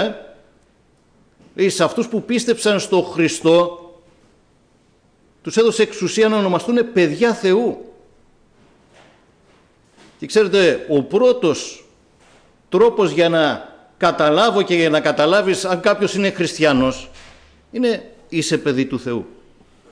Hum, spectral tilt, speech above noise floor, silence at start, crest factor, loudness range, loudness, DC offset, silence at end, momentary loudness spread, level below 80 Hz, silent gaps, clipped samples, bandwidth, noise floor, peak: none; -4.5 dB/octave; 40 dB; 0 s; 14 dB; 5 LU; -17 LUFS; under 0.1%; 0.65 s; 11 LU; -54 dBFS; none; under 0.1%; 10.5 kHz; -56 dBFS; -6 dBFS